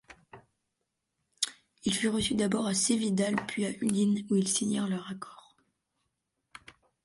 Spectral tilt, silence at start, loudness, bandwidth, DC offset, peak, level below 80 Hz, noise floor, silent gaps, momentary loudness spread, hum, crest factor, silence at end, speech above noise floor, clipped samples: -4 dB/octave; 0.1 s; -29 LUFS; 11.5 kHz; under 0.1%; -12 dBFS; -62 dBFS; -83 dBFS; none; 9 LU; none; 20 dB; 1.7 s; 54 dB; under 0.1%